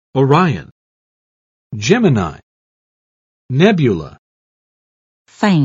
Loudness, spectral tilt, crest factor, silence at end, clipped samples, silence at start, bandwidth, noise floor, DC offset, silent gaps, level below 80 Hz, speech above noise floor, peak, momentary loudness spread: -15 LUFS; -6.5 dB/octave; 18 dB; 0 s; under 0.1%; 0.15 s; 8 kHz; under -90 dBFS; under 0.1%; 0.71-1.70 s, 2.43-3.49 s, 4.18-5.25 s; -50 dBFS; over 77 dB; 0 dBFS; 13 LU